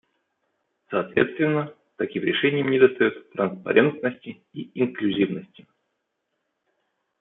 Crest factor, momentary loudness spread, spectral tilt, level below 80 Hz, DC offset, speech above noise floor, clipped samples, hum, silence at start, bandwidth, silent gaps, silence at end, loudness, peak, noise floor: 22 dB; 17 LU; -10 dB/octave; -68 dBFS; under 0.1%; 55 dB; under 0.1%; none; 0.9 s; 4 kHz; none; 1.75 s; -23 LUFS; -4 dBFS; -78 dBFS